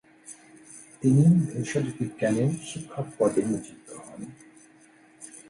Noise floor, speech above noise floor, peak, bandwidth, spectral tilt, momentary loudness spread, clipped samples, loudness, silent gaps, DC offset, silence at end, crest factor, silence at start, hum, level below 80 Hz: -56 dBFS; 31 dB; -8 dBFS; 11.5 kHz; -7.5 dB/octave; 25 LU; under 0.1%; -25 LUFS; none; under 0.1%; 0.15 s; 18 dB; 0.3 s; none; -64 dBFS